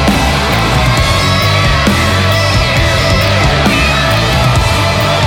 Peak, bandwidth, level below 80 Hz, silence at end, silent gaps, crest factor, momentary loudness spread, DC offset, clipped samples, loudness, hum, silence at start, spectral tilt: 0 dBFS; 17.5 kHz; -20 dBFS; 0 s; none; 10 dB; 1 LU; under 0.1%; under 0.1%; -10 LUFS; none; 0 s; -4.5 dB/octave